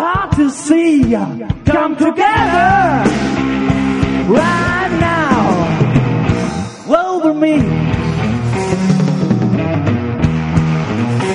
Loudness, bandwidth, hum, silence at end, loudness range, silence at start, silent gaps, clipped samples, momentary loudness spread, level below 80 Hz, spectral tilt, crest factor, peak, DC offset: -14 LUFS; 10.5 kHz; none; 0 s; 2 LU; 0 s; none; under 0.1%; 5 LU; -32 dBFS; -7 dB/octave; 14 dB; 0 dBFS; under 0.1%